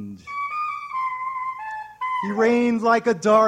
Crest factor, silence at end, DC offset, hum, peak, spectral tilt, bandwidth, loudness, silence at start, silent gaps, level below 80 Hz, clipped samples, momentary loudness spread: 16 dB; 0 s; under 0.1%; none; -6 dBFS; -5.5 dB/octave; 10 kHz; -23 LUFS; 0 s; none; -66 dBFS; under 0.1%; 11 LU